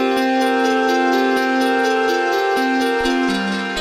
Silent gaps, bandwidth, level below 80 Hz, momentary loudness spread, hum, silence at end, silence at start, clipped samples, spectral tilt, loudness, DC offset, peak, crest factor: none; 16.5 kHz; -48 dBFS; 2 LU; none; 0 s; 0 s; under 0.1%; -4 dB/octave; -17 LUFS; under 0.1%; -4 dBFS; 12 dB